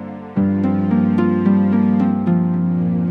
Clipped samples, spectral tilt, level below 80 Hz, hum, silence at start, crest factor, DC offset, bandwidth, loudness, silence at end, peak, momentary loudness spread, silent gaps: under 0.1%; -11 dB/octave; -58 dBFS; none; 0 s; 12 dB; under 0.1%; 4 kHz; -17 LUFS; 0 s; -4 dBFS; 3 LU; none